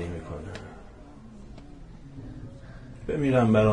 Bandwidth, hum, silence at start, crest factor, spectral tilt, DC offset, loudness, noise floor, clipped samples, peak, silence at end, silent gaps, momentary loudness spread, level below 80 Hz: 10 kHz; none; 0 s; 18 dB; -8 dB/octave; under 0.1%; -27 LUFS; -46 dBFS; under 0.1%; -10 dBFS; 0 s; none; 25 LU; -46 dBFS